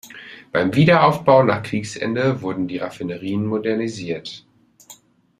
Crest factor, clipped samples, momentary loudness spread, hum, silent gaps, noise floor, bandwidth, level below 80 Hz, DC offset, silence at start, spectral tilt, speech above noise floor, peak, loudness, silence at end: 18 dB; under 0.1%; 15 LU; none; none; -48 dBFS; 15 kHz; -58 dBFS; under 0.1%; 0.05 s; -6.5 dB/octave; 29 dB; -2 dBFS; -19 LUFS; 0.45 s